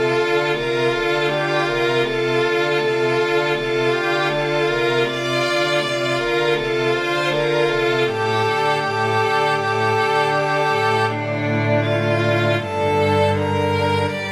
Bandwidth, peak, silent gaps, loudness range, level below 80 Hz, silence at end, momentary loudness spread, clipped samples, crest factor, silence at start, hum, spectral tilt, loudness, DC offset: 14 kHz; -4 dBFS; none; 1 LU; -50 dBFS; 0 s; 2 LU; under 0.1%; 14 dB; 0 s; none; -5.5 dB/octave; -19 LUFS; under 0.1%